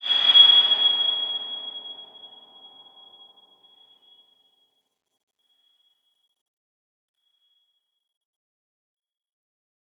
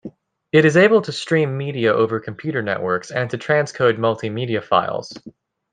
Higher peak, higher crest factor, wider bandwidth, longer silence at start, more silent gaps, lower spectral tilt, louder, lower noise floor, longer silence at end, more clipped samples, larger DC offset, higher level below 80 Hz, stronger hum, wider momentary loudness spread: about the same, -4 dBFS vs -2 dBFS; first, 24 dB vs 18 dB; second, 7.8 kHz vs 9.4 kHz; about the same, 0.05 s vs 0.05 s; neither; second, 0 dB/octave vs -6 dB/octave; first, -15 LUFS vs -19 LUFS; first, -75 dBFS vs -39 dBFS; first, 7.7 s vs 0.4 s; neither; neither; second, under -90 dBFS vs -62 dBFS; neither; first, 25 LU vs 11 LU